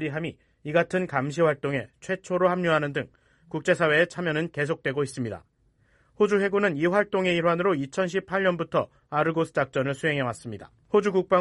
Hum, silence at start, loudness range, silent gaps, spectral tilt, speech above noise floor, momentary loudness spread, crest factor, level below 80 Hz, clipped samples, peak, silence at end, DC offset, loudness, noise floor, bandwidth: none; 0 s; 2 LU; none; -6 dB/octave; 39 dB; 11 LU; 18 dB; -62 dBFS; under 0.1%; -8 dBFS; 0 s; under 0.1%; -25 LUFS; -64 dBFS; 11.5 kHz